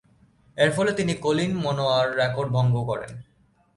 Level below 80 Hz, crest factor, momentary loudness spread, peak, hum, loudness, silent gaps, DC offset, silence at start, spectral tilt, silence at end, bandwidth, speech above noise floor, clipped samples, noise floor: -56 dBFS; 18 dB; 11 LU; -6 dBFS; none; -24 LUFS; none; under 0.1%; 0.55 s; -6 dB/octave; 0.55 s; 11.5 kHz; 35 dB; under 0.1%; -58 dBFS